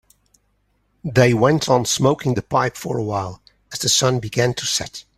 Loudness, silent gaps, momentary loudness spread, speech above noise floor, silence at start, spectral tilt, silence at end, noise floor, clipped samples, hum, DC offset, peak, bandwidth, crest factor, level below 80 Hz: -19 LUFS; none; 9 LU; 46 dB; 1.05 s; -4 dB/octave; 0.15 s; -65 dBFS; under 0.1%; 50 Hz at -50 dBFS; under 0.1%; -2 dBFS; 14.5 kHz; 18 dB; -50 dBFS